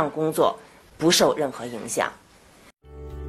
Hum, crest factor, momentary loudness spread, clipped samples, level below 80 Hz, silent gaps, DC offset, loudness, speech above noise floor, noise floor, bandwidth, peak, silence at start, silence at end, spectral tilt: none; 20 dB; 21 LU; under 0.1%; -48 dBFS; none; under 0.1%; -23 LUFS; 30 dB; -53 dBFS; 13 kHz; -6 dBFS; 0 s; 0 s; -3.5 dB/octave